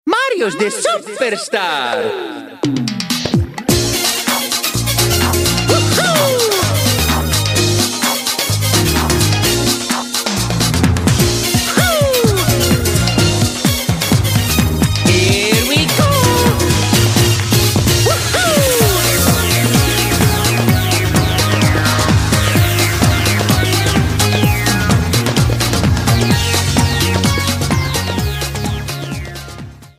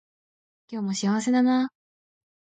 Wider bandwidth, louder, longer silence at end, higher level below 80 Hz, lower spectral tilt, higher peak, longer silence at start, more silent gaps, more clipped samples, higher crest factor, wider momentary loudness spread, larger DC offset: first, 16 kHz vs 9.2 kHz; first, -13 LUFS vs -25 LUFS; second, 0.1 s vs 0.75 s; first, -28 dBFS vs -78 dBFS; about the same, -4 dB/octave vs -5 dB/octave; first, 0 dBFS vs -12 dBFS; second, 0.05 s vs 0.7 s; neither; neither; about the same, 14 dB vs 14 dB; second, 6 LU vs 11 LU; neither